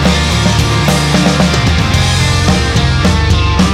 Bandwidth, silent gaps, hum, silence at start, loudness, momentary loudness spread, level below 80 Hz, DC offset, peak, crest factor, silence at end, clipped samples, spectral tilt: 15.5 kHz; none; none; 0 s; -11 LUFS; 1 LU; -18 dBFS; under 0.1%; 0 dBFS; 10 dB; 0 s; under 0.1%; -5 dB/octave